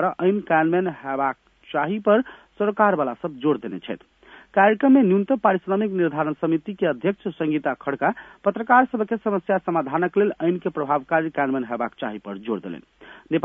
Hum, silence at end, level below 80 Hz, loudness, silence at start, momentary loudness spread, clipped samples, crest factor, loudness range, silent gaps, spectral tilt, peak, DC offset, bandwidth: none; 0.05 s; -66 dBFS; -22 LUFS; 0 s; 12 LU; under 0.1%; 20 dB; 3 LU; none; -9.5 dB/octave; -2 dBFS; under 0.1%; 3.8 kHz